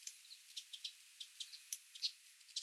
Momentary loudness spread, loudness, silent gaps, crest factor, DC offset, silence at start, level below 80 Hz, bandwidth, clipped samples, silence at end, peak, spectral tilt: 11 LU; -48 LUFS; none; 26 dB; under 0.1%; 0 s; under -90 dBFS; 16 kHz; under 0.1%; 0 s; -26 dBFS; 9 dB/octave